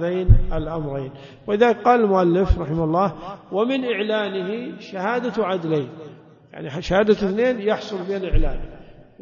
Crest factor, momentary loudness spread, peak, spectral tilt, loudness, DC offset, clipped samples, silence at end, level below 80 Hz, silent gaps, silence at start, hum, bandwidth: 20 dB; 16 LU; 0 dBFS; -7.5 dB/octave; -21 LUFS; under 0.1%; under 0.1%; 0.3 s; -28 dBFS; none; 0 s; none; 7.2 kHz